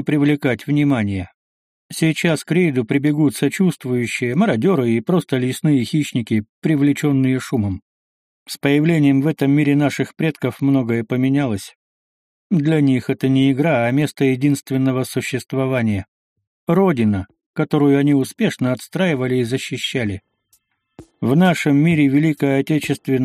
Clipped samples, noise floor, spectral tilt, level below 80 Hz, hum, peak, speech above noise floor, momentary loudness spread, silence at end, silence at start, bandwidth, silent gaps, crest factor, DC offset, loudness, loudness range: under 0.1%; -62 dBFS; -6.5 dB/octave; -56 dBFS; none; -2 dBFS; 45 dB; 8 LU; 0 s; 0 s; 15.5 kHz; 1.34-1.89 s, 6.49-6.62 s, 7.82-8.46 s, 11.75-12.50 s, 16.08-16.36 s, 16.47-16.67 s, 17.46-17.54 s; 16 dB; under 0.1%; -18 LUFS; 2 LU